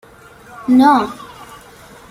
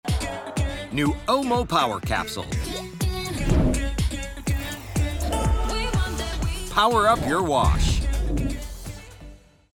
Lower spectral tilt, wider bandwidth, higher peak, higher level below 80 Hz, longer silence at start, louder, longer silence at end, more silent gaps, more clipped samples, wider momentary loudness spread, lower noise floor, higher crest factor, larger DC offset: about the same, -5 dB/octave vs -5 dB/octave; second, 15 kHz vs 18.5 kHz; first, -2 dBFS vs -6 dBFS; second, -52 dBFS vs -28 dBFS; first, 0.6 s vs 0.05 s; first, -13 LUFS vs -24 LUFS; first, 0.95 s vs 0.35 s; neither; neither; first, 25 LU vs 9 LU; second, -41 dBFS vs -45 dBFS; about the same, 16 dB vs 18 dB; neither